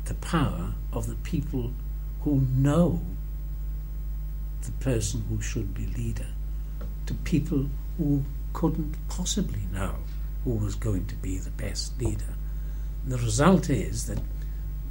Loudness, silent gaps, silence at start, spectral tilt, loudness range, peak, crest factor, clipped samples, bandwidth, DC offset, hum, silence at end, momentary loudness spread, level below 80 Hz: -29 LUFS; none; 0 s; -6 dB/octave; 4 LU; -6 dBFS; 22 dB; under 0.1%; 16.5 kHz; under 0.1%; none; 0 s; 12 LU; -32 dBFS